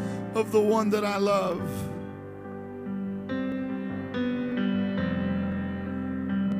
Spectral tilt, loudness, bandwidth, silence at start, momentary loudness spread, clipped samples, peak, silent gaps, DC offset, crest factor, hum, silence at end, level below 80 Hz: -7 dB/octave; -28 LUFS; 15.5 kHz; 0 s; 13 LU; under 0.1%; -12 dBFS; none; under 0.1%; 16 dB; none; 0 s; -60 dBFS